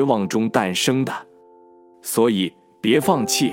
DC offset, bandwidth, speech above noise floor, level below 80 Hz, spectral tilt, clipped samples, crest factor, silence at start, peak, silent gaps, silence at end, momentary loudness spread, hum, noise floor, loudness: under 0.1%; 17 kHz; 30 dB; -66 dBFS; -4 dB/octave; under 0.1%; 18 dB; 0 s; -2 dBFS; none; 0 s; 9 LU; none; -49 dBFS; -20 LUFS